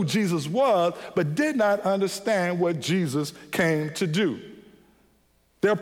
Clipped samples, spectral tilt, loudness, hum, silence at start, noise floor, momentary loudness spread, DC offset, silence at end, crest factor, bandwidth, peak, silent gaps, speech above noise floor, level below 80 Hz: under 0.1%; -5.5 dB/octave; -25 LUFS; none; 0 s; -64 dBFS; 6 LU; under 0.1%; 0 s; 16 dB; 17 kHz; -10 dBFS; none; 40 dB; -66 dBFS